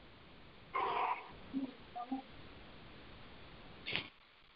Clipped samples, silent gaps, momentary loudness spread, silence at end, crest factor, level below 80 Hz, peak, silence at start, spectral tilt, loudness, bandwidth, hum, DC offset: under 0.1%; none; 20 LU; 0 s; 28 dB; -66 dBFS; -16 dBFS; 0 s; -2 dB/octave; -42 LUFS; 5.6 kHz; none; under 0.1%